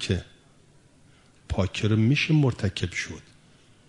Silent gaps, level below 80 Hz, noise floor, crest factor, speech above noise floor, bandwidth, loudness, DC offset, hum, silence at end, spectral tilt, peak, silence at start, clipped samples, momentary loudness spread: none; -48 dBFS; -57 dBFS; 18 dB; 33 dB; 11 kHz; -25 LUFS; under 0.1%; none; 0.65 s; -6 dB/octave; -10 dBFS; 0 s; under 0.1%; 12 LU